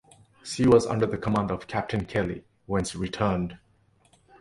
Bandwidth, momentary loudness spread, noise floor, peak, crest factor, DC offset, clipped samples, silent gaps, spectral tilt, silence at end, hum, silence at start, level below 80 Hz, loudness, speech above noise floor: 11.5 kHz; 15 LU; -63 dBFS; -6 dBFS; 22 dB; under 0.1%; under 0.1%; none; -6 dB/octave; 0.85 s; none; 0.45 s; -48 dBFS; -26 LUFS; 38 dB